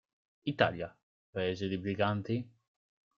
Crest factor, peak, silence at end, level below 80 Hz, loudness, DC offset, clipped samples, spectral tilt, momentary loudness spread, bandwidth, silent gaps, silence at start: 24 dB; -12 dBFS; 0.7 s; -68 dBFS; -34 LUFS; under 0.1%; under 0.1%; -4.5 dB/octave; 13 LU; 7.2 kHz; 1.03-1.33 s; 0.45 s